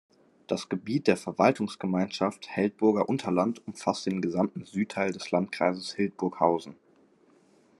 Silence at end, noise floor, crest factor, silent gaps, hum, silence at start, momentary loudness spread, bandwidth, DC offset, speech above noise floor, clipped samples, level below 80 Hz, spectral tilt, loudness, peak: 1.05 s; -62 dBFS; 22 dB; none; none; 0.5 s; 7 LU; 12 kHz; under 0.1%; 34 dB; under 0.1%; -76 dBFS; -6 dB/octave; -28 LUFS; -6 dBFS